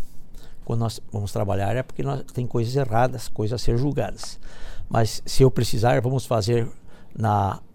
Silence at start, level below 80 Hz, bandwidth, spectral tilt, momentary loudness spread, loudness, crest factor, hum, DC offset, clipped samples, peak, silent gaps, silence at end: 0 s; -34 dBFS; 16.5 kHz; -6.5 dB/octave; 17 LU; -24 LUFS; 18 dB; none; under 0.1%; under 0.1%; -4 dBFS; none; 0.05 s